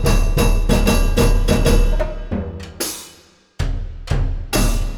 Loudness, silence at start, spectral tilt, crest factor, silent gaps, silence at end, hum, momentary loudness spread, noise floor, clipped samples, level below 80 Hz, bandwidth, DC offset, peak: -19 LUFS; 0 s; -5 dB/octave; 14 dB; none; 0 s; none; 11 LU; -48 dBFS; under 0.1%; -18 dBFS; 18.5 kHz; under 0.1%; -2 dBFS